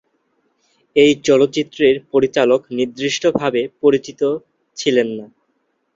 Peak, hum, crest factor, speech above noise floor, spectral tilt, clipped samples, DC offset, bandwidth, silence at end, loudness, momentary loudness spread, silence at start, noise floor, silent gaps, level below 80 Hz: -2 dBFS; none; 16 dB; 51 dB; -4.5 dB/octave; under 0.1%; under 0.1%; 7.6 kHz; 0.7 s; -17 LUFS; 9 LU; 0.95 s; -67 dBFS; none; -58 dBFS